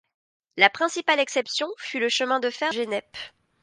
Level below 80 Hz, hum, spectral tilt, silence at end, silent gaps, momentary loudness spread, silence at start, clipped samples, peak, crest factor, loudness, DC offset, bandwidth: -74 dBFS; none; -1.5 dB/octave; 0.35 s; none; 19 LU; 0.55 s; under 0.1%; 0 dBFS; 26 dB; -23 LUFS; under 0.1%; 11 kHz